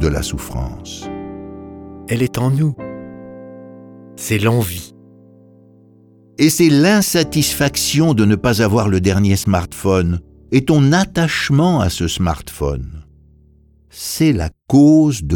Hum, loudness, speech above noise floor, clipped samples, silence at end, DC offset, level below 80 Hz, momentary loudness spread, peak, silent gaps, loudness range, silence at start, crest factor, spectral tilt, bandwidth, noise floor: none; -15 LUFS; 35 dB; under 0.1%; 0 s; under 0.1%; -34 dBFS; 20 LU; -2 dBFS; none; 9 LU; 0 s; 16 dB; -5.5 dB/octave; 19 kHz; -50 dBFS